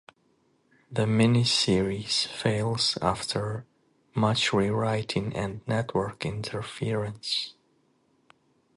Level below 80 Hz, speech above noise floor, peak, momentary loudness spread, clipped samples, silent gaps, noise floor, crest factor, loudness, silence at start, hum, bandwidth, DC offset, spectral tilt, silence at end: -54 dBFS; 41 dB; -8 dBFS; 11 LU; under 0.1%; none; -68 dBFS; 22 dB; -27 LUFS; 0.9 s; none; 11.5 kHz; under 0.1%; -5 dB/octave; 1.25 s